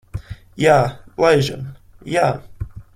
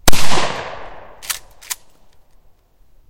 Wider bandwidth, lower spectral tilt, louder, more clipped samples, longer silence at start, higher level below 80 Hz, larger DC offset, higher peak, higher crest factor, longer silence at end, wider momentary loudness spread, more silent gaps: about the same, 16 kHz vs 17 kHz; first, -6 dB/octave vs -2.5 dB/octave; first, -17 LUFS vs -23 LUFS; second, under 0.1% vs 0.8%; about the same, 0.15 s vs 0.05 s; second, -42 dBFS vs -30 dBFS; neither; about the same, -2 dBFS vs 0 dBFS; about the same, 18 dB vs 14 dB; second, 0.15 s vs 1.35 s; first, 20 LU vs 15 LU; neither